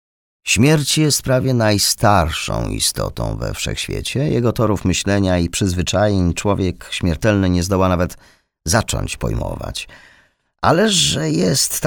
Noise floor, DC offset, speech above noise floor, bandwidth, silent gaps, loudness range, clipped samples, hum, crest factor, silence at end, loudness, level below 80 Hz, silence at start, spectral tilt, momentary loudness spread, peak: -56 dBFS; under 0.1%; 39 dB; over 20 kHz; none; 4 LU; under 0.1%; none; 16 dB; 0 s; -17 LUFS; -34 dBFS; 0.45 s; -4.5 dB/octave; 10 LU; 0 dBFS